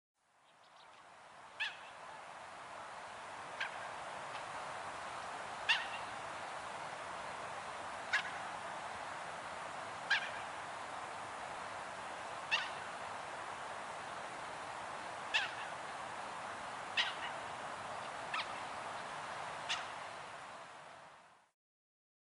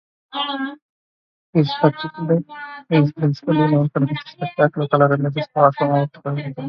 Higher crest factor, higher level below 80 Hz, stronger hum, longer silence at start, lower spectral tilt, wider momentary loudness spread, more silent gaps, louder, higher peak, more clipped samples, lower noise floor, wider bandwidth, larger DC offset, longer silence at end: about the same, 24 dB vs 20 dB; second, -78 dBFS vs -62 dBFS; neither; about the same, 0.45 s vs 0.35 s; second, -1.5 dB/octave vs -9.5 dB/octave; first, 14 LU vs 11 LU; second, none vs 0.82-1.53 s; second, -42 LUFS vs -19 LUFS; second, -20 dBFS vs 0 dBFS; neither; second, -68 dBFS vs under -90 dBFS; first, 11 kHz vs 5.8 kHz; neither; first, 0.9 s vs 0 s